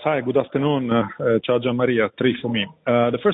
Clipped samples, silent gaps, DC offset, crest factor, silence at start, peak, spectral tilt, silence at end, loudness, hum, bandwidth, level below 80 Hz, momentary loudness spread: under 0.1%; none; under 0.1%; 14 dB; 0 s; -6 dBFS; -9.5 dB/octave; 0 s; -21 LUFS; none; 4 kHz; -60 dBFS; 3 LU